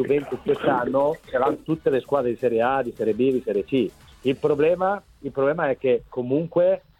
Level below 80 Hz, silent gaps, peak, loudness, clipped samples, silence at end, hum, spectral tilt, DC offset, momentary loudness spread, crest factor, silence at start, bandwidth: -54 dBFS; none; -8 dBFS; -23 LUFS; under 0.1%; 0.2 s; none; -7.5 dB/octave; under 0.1%; 5 LU; 16 dB; 0 s; 13 kHz